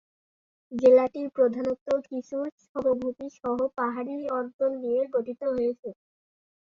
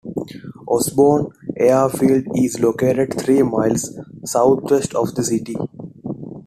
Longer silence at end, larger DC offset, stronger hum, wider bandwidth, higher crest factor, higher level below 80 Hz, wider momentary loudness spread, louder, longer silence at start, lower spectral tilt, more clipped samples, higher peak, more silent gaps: first, 0.8 s vs 0.05 s; neither; neither; second, 7 kHz vs 14.5 kHz; about the same, 20 dB vs 16 dB; second, -68 dBFS vs -52 dBFS; about the same, 13 LU vs 15 LU; second, -27 LUFS vs -18 LUFS; first, 0.7 s vs 0.05 s; about the same, -7 dB/octave vs -6 dB/octave; neither; second, -8 dBFS vs -2 dBFS; first, 1.81-1.86 s, 2.52-2.58 s, 2.69-2.75 s, 4.54-4.59 s, 5.79-5.83 s vs none